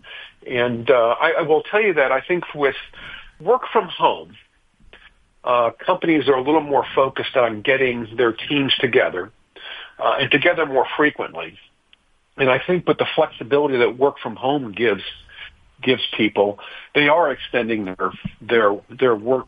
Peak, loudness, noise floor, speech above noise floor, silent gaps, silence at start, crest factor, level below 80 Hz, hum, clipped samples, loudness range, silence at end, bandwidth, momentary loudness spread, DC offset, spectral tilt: -2 dBFS; -19 LUFS; -58 dBFS; 39 dB; none; 0.05 s; 18 dB; -56 dBFS; none; under 0.1%; 3 LU; 0.05 s; 5 kHz; 16 LU; under 0.1%; -7.5 dB/octave